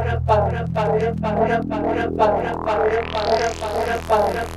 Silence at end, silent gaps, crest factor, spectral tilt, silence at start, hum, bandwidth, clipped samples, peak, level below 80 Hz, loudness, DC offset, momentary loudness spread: 0 s; none; 16 dB; -6.5 dB/octave; 0 s; none; 14 kHz; under 0.1%; -4 dBFS; -36 dBFS; -20 LUFS; under 0.1%; 4 LU